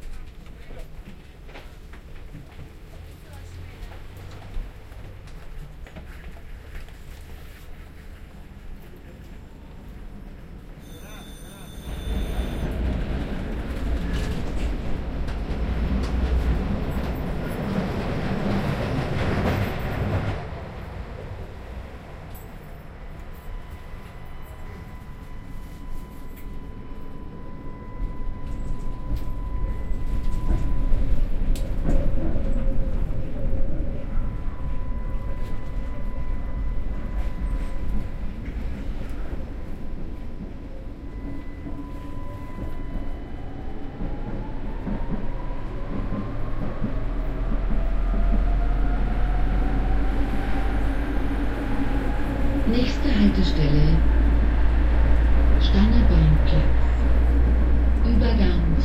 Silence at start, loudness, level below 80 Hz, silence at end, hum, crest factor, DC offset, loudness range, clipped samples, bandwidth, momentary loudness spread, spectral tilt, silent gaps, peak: 0 s; -27 LUFS; -26 dBFS; 0 s; none; 18 dB; under 0.1%; 21 LU; under 0.1%; 9.6 kHz; 21 LU; -7.5 dB/octave; none; -4 dBFS